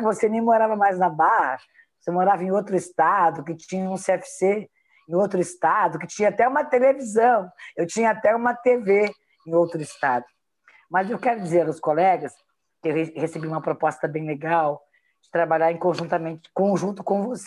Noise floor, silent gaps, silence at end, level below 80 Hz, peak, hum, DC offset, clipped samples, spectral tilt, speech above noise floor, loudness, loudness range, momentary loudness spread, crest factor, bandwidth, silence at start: -58 dBFS; none; 0 s; -72 dBFS; -6 dBFS; none; under 0.1%; under 0.1%; -6 dB/octave; 36 dB; -22 LUFS; 4 LU; 9 LU; 16 dB; 12 kHz; 0 s